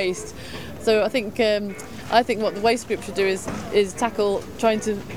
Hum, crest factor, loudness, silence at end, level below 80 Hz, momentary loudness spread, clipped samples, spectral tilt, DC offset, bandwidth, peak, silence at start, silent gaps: none; 20 dB; -23 LUFS; 0 s; -50 dBFS; 12 LU; under 0.1%; -4 dB/octave; 0.6%; 19 kHz; -4 dBFS; 0 s; none